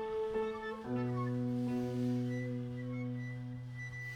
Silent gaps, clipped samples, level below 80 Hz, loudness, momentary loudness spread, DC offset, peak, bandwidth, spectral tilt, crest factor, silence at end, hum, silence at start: none; under 0.1%; -64 dBFS; -38 LUFS; 8 LU; under 0.1%; -26 dBFS; 10 kHz; -8.5 dB/octave; 12 dB; 0 s; none; 0 s